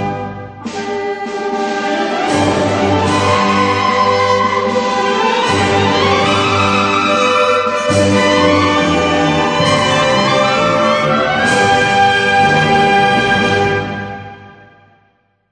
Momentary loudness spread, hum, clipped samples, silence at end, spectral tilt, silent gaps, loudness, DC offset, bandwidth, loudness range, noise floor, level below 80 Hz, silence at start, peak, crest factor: 9 LU; none; under 0.1%; 1 s; -4.5 dB/octave; none; -12 LUFS; under 0.1%; 11 kHz; 3 LU; -57 dBFS; -44 dBFS; 0 s; 0 dBFS; 14 dB